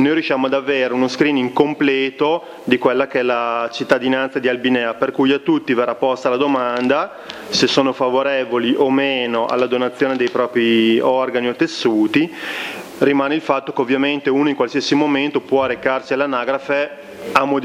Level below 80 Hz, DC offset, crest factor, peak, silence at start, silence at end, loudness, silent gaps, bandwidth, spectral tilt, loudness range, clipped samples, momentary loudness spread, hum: -60 dBFS; under 0.1%; 18 dB; 0 dBFS; 0 s; 0 s; -17 LUFS; none; 15 kHz; -5 dB/octave; 1 LU; under 0.1%; 4 LU; none